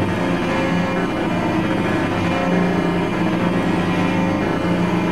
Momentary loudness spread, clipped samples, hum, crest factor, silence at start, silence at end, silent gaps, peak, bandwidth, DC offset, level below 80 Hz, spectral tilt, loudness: 2 LU; under 0.1%; 60 Hz at -35 dBFS; 14 dB; 0 s; 0 s; none; -4 dBFS; 12.5 kHz; 1%; -42 dBFS; -7 dB/octave; -19 LUFS